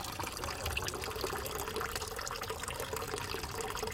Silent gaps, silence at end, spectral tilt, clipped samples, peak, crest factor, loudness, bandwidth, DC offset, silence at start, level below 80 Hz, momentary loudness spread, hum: none; 0 s; -2.5 dB/octave; under 0.1%; -18 dBFS; 22 dB; -38 LUFS; 17 kHz; under 0.1%; 0 s; -50 dBFS; 2 LU; none